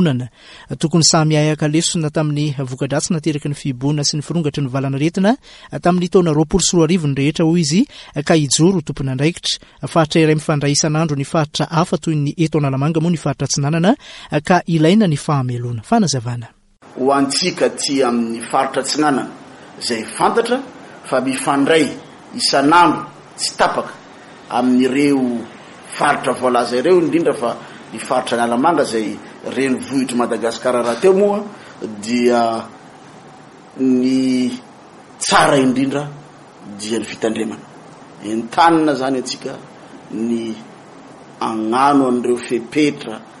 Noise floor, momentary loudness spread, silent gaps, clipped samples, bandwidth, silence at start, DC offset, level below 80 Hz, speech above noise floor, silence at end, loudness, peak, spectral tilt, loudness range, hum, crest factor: -41 dBFS; 13 LU; none; under 0.1%; 11.5 kHz; 0 s; under 0.1%; -48 dBFS; 24 dB; 0 s; -17 LUFS; 0 dBFS; -5 dB/octave; 3 LU; none; 16 dB